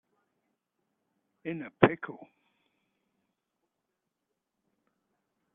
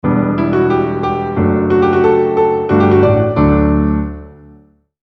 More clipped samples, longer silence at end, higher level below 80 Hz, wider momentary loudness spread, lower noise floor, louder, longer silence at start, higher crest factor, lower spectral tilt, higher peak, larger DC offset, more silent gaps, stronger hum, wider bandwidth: neither; first, 3.3 s vs 0.75 s; second, -72 dBFS vs -28 dBFS; first, 18 LU vs 6 LU; first, -85 dBFS vs -46 dBFS; second, -29 LUFS vs -13 LUFS; first, 1.45 s vs 0.05 s; first, 34 dB vs 12 dB; second, -5.5 dB/octave vs -10 dB/octave; second, -4 dBFS vs 0 dBFS; neither; neither; neither; second, 4 kHz vs 6 kHz